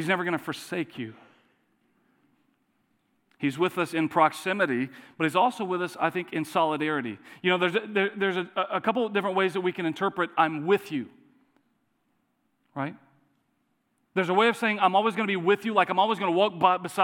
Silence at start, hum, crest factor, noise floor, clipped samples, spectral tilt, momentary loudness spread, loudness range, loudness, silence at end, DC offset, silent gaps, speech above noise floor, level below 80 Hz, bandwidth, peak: 0 s; none; 22 dB; -73 dBFS; under 0.1%; -5.5 dB/octave; 11 LU; 9 LU; -26 LUFS; 0 s; under 0.1%; none; 47 dB; -84 dBFS; 17.5 kHz; -6 dBFS